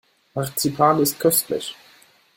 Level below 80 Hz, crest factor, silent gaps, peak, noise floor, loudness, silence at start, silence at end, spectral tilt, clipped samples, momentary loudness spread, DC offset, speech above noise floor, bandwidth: -60 dBFS; 20 dB; none; -2 dBFS; -54 dBFS; -20 LUFS; 0.35 s; 0.65 s; -4 dB/octave; under 0.1%; 13 LU; under 0.1%; 33 dB; 17 kHz